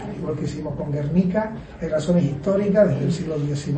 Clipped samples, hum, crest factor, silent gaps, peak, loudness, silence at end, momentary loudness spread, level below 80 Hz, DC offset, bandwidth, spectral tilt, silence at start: under 0.1%; none; 18 dB; none; -4 dBFS; -22 LUFS; 0 s; 10 LU; -44 dBFS; under 0.1%; 8.8 kHz; -8 dB/octave; 0 s